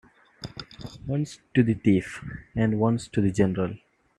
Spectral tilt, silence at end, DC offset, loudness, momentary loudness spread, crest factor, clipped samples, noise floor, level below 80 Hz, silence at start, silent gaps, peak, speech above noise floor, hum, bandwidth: -7.5 dB/octave; 0.4 s; under 0.1%; -25 LUFS; 17 LU; 20 dB; under 0.1%; -44 dBFS; -52 dBFS; 0.4 s; none; -6 dBFS; 19 dB; none; 11 kHz